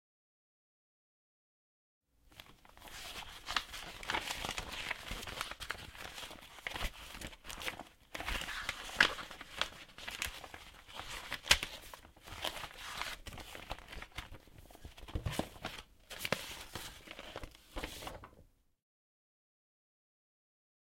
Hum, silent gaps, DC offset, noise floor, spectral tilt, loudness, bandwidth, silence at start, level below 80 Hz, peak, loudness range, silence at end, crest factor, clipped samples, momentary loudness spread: none; none; under 0.1%; -65 dBFS; -2 dB/octave; -40 LUFS; 16.5 kHz; 2.25 s; -54 dBFS; -8 dBFS; 12 LU; 2.4 s; 36 dB; under 0.1%; 15 LU